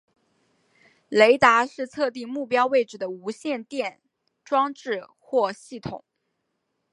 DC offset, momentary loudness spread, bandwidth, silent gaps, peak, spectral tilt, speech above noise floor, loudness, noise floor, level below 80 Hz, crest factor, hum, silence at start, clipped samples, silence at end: under 0.1%; 16 LU; 11.5 kHz; none; -2 dBFS; -4 dB/octave; 54 dB; -23 LUFS; -77 dBFS; -66 dBFS; 22 dB; none; 1.1 s; under 0.1%; 0.95 s